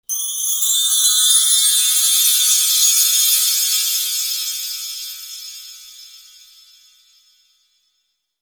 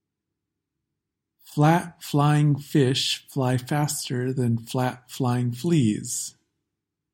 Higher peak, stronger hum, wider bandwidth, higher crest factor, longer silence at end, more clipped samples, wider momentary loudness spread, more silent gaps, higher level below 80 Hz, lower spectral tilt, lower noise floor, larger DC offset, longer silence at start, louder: first, 0 dBFS vs -6 dBFS; neither; first, over 20 kHz vs 17 kHz; about the same, 18 dB vs 18 dB; first, 2.25 s vs 0.85 s; neither; first, 18 LU vs 8 LU; neither; about the same, -66 dBFS vs -64 dBFS; second, 9 dB/octave vs -5.5 dB/octave; second, -70 dBFS vs -83 dBFS; neither; second, 0.1 s vs 1.5 s; first, -13 LUFS vs -24 LUFS